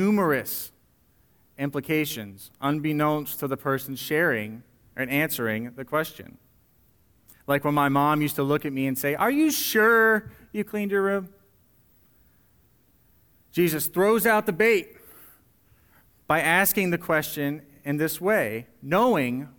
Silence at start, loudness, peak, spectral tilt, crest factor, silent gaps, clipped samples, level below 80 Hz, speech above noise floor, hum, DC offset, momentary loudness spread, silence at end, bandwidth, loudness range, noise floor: 0 s; -24 LUFS; -6 dBFS; -5 dB/octave; 20 dB; none; under 0.1%; -62 dBFS; 39 dB; none; under 0.1%; 13 LU; 0.1 s; over 20 kHz; 6 LU; -63 dBFS